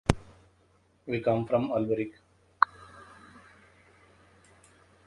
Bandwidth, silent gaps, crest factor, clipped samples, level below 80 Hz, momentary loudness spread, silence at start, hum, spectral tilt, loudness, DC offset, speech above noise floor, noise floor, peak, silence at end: 11.5 kHz; none; 30 dB; under 0.1%; -48 dBFS; 23 LU; 0.1 s; none; -6.5 dB/octave; -29 LUFS; under 0.1%; 37 dB; -65 dBFS; -2 dBFS; 1.7 s